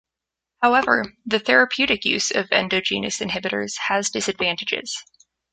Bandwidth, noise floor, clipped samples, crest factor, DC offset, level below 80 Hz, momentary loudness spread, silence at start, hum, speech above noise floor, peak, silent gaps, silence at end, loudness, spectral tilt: 9.6 kHz; -86 dBFS; under 0.1%; 20 dB; under 0.1%; -58 dBFS; 8 LU; 0.6 s; none; 64 dB; -2 dBFS; none; 0.5 s; -20 LUFS; -2 dB/octave